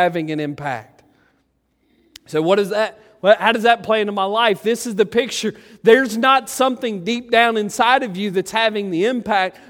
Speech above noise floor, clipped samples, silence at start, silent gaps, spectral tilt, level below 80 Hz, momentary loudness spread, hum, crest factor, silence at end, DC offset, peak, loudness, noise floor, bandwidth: 47 dB; under 0.1%; 0 s; none; -4 dB/octave; -62 dBFS; 10 LU; none; 18 dB; 0.2 s; under 0.1%; 0 dBFS; -18 LUFS; -65 dBFS; 17 kHz